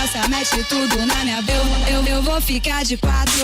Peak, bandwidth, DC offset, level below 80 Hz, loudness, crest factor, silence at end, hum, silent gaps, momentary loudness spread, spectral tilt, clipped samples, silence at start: -8 dBFS; 16.5 kHz; under 0.1%; -22 dBFS; -18 LUFS; 10 dB; 0 s; none; none; 1 LU; -3 dB/octave; under 0.1%; 0 s